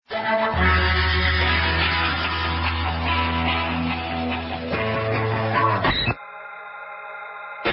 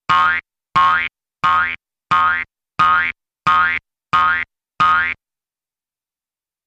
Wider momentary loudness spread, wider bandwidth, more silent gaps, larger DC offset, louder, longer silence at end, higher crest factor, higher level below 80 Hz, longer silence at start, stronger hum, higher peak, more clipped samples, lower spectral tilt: first, 16 LU vs 10 LU; second, 5.8 kHz vs 9 kHz; neither; neither; second, -21 LUFS vs -16 LUFS; second, 0 s vs 1.55 s; about the same, 18 dB vs 16 dB; first, -30 dBFS vs -52 dBFS; about the same, 0.1 s vs 0.1 s; first, 60 Hz at -60 dBFS vs none; second, -6 dBFS vs -2 dBFS; neither; first, -10 dB/octave vs -3 dB/octave